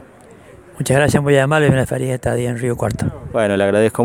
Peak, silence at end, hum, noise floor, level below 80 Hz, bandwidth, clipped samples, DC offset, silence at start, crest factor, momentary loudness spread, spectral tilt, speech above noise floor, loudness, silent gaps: 0 dBFS; 0 s; none; -42 dBFS; -42 dBFS; 16.5 kHz; under 0.1%; under 0.1%; 0 s; 16 dB; 7 LU; -6 dB/octave; 27 dB; -17 LUFS; none